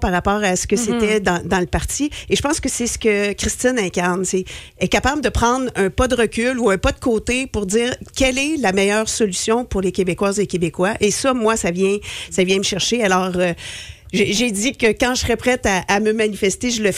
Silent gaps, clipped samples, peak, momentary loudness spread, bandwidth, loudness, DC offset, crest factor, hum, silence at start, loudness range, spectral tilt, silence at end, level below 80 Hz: none; under 0.1%; -6 dBFS; 4 LU; 15.5 kHz; -18 LUFS; under 0.1%; 14 dB; none; 0 s; 1 LU; -3.5 dB/octave; 0 s; -34 dBFS